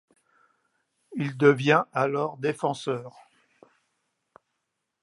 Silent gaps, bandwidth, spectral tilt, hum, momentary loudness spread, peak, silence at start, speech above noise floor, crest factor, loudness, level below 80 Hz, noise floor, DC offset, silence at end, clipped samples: none; 11.5 kHz; -6.5 dB/octave; none; 13 LU; -4 dBFS; 1.1 s; 56 dB; 24 dB; -25 LUFS; -78 dBFS; -81 dBFS; under 0.1%; 1.95 s; under 0.1%